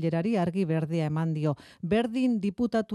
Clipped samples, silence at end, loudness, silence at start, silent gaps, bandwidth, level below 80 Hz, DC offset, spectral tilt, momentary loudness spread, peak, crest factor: under 0.1%; 0 s; -28 LUFS; 0 s; none; 11.5 kHz; -62 dBFS; under 0.1%; -8 dB/octave; 3 LU; -14 dBFS; 14 dB